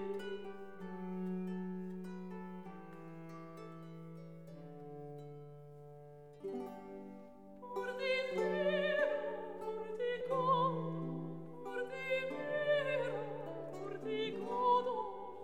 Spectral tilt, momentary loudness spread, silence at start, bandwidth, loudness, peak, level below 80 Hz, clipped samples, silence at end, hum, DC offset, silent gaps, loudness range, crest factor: -6.5 dB/octave; 19 LU; 0 s; 14.5 kHz; -39 LUFS; -22 dBFS; -76 dBFS; under 0.1%; 0 s; none; 0.2%; none; 14 LU; 18 dB